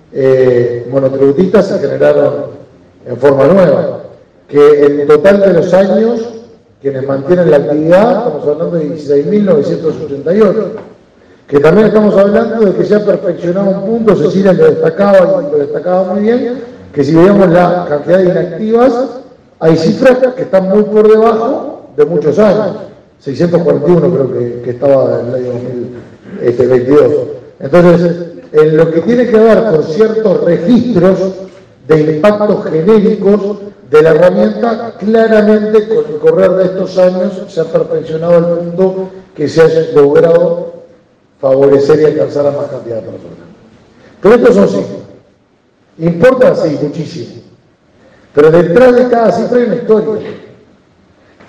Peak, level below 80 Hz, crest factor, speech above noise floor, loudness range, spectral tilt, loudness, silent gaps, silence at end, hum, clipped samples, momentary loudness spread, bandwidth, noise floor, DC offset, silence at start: 0 dBFS; -46 dBFS; 10 dB; 42 dB; 3 LU; -8 dB/octave; -9 LUFS; none; 1.1 s; none; 1%; 12 LU; 8.4 kHz; -50 dBFS; under 0.1%; 0.15 s